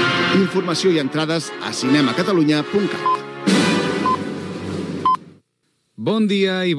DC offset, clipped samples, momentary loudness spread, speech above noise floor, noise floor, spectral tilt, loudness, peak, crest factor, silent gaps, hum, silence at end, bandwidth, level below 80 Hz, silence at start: under 0.1%; under 0.1%; 9 LU; 50 dB; -68 dBFS; -5 dB/octave; -19 LUFS; -4 dBFS; 14 dB; none; none; 0 s; 12 kHz; -66 dBFS; 0 s